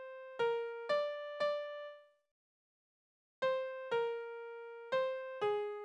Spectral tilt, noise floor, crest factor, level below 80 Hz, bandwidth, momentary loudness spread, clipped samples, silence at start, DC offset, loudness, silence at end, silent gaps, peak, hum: -3.5 dB/octave; under -90 dBFS; 16 dB; -86 dBFS; 9.2 kHz; 12 LU; under 0.1%; 0 s; under 0.1%; -39 LUFS; 0 s; 2.31-3.42 s; -24 dBFS; none